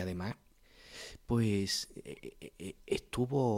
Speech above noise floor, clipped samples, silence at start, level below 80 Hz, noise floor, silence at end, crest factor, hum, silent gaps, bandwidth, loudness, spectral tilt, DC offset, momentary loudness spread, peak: 24 dB; under 0.1%; 0 s; -58 dBFS; -58 dBFS; 0 s; 18 dB; none; none; 16.5 kHz; -35 LUFS; -5.5 dB/octave; under 0.1%; 17 LU; -18 dBFS